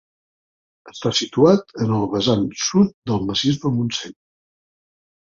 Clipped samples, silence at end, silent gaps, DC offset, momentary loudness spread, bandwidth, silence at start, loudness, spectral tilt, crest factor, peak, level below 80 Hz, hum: under 0.1%; 1.1 s; 2.94-3.02 s; under 0.1%; 10 LU; 7.6 kHz; 0.85 s; -19 LUFS; -5.5 dB/octave; 18 dB; -2 dBFS; -52 dBFS; none